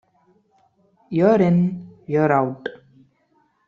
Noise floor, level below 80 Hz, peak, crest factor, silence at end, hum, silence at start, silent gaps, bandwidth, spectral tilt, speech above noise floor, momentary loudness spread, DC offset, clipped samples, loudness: -64 dBFS; -60 dBFS; -4 dBFS; 18 dB; 0.9 s; none; 1.1 s; none; 6.4 kHz; -9.5 dB/octave; 46 dB; 17 LU; under 0.1%; under 0.1%; -19 LUFS